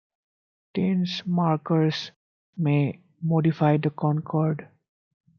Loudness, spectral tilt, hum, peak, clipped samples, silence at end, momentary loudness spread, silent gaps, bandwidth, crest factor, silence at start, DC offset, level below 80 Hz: -25 LUFS; -8 dB/octave; none; -6 dBFS; under 0.1%; 0.75 s; 10 LU; 2.16-2.53 s; 6.6 kHz; 18 dB; 0.75 s; under 0.1%; -70 dBFS